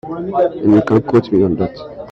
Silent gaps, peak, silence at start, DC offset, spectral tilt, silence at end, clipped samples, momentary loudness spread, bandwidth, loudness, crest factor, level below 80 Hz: none; 0 dBFS; 0.05 s; under 0.1%; -9.5 dB/octave; 0 s; under 0.1%; 9 LU; 6.2 kHz; -15 LUFS; 14 dB; -46 dBFS